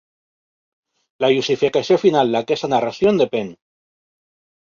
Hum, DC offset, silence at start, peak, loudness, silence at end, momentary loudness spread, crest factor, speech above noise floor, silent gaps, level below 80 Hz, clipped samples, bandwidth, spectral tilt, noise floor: none; under 0.1%; 1.2 s; -2 dBFS; -18 LUFS; 1.15 s; 5 LU; 18 dB; over 73 dB; none; -60 dBFS; under 0.1%; 7.4 kHz; -5.5 dB/octave; under -90 dBFS